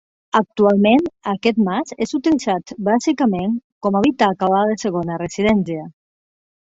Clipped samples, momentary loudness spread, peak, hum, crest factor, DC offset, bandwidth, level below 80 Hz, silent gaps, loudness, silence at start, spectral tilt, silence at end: under 0.1%; 8 LU; -2 dBFS; none; 18 dB; under 0.1%; 7.8 kHz; -52 dBFS; 3.64-3.81 s; -18 LUFS; 0.35 s; -6 dB/octave; 0.75 s